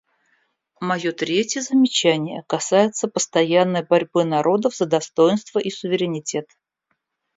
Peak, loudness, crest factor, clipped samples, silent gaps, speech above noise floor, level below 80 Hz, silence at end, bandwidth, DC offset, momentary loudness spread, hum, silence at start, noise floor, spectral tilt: -4 dBFS; -20 LUFS; 18 dB; under 0.1%; none; 54 dB; -68 dBFS; 0.95 s; 7.8 kHz; under 0.1%; 8 LU; none; 0.8 s; -74 dBFS; -4 dB/octave